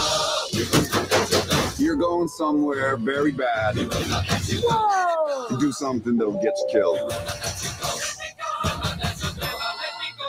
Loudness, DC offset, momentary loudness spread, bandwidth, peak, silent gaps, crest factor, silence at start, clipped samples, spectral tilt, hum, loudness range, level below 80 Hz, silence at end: -23 LUFS; under 0.1%; 7 LU; 16 kHz; -6 dBFS; none; 18 dB; 0 s; under 0.1%; -4 dB/octave; none; 4 LU; -46 dBFS; 0 s